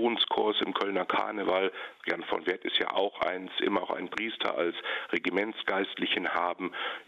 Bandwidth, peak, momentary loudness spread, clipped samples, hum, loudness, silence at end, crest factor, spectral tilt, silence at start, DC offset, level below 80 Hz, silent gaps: 8.6 kHz; -12 dBFS; 6 LU; under 0.1%; none; -30 LUFS; 0.05 s; 18 dB; -5 dB/octave; 0 s; under 0.1%; -72 dBFS; none